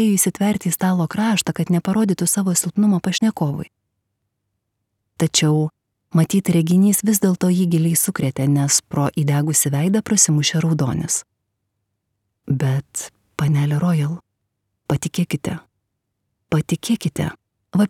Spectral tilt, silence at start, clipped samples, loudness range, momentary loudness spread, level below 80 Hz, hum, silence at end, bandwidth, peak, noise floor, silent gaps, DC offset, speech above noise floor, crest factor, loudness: -5 dB/octave; 0 s; under 0.1%; 6 LU; 10 LU; -54 dBFS; none; 0 s; 17 kHz; -2 dBFS; -75 dBFS; none; under 0.1%; 57 dB; 18 dB; -19 LUFS